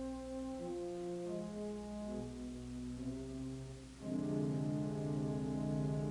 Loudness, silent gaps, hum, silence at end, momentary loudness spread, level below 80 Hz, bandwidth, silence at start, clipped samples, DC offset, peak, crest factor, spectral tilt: -42 LUFS; none; 60 Hz at -60 dBFS; 0 s; 8 LU; -58 dBFS; 11.5 kHz; 0 s; under 0.1%; under 0.1%; -26 dBFS; 14 dB; -7.5 dB/octave